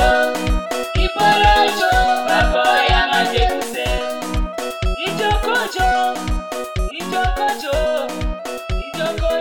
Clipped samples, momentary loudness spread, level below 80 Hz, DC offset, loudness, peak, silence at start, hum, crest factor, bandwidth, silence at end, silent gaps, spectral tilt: under 0.1%; 11 LU; -24 dBFS; 0.7%; -18 LUFS; -4 dBFS; 0 s; none; 14 dB; 18 kHz; 0 s; none; -4 dB/octave